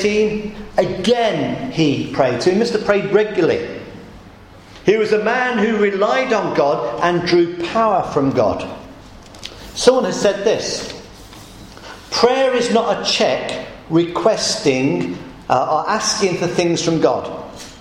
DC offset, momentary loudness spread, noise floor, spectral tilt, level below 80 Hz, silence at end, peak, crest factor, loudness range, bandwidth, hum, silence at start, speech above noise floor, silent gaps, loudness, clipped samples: under 0.1%; 16 LU; -41 dBFS; -4.5 dB/octave; -46 dBFS; 0 s; 0 dBFS; 18 dB; 2 LU; 15.5 kHz; none; 0 s; 24 dB; none; -17 LUFS; under 0.1%